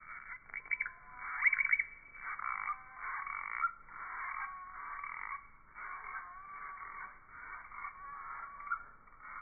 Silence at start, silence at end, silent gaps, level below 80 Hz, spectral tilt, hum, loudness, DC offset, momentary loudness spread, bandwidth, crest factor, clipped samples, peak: 0 s; 0 s; none; -66 dBFS; 6.5 dB/octave; none; -39 LUFS; under 0.1%; 17 LU; 2.6 kHz; 24 dB; under 0.1%; -18 dBFS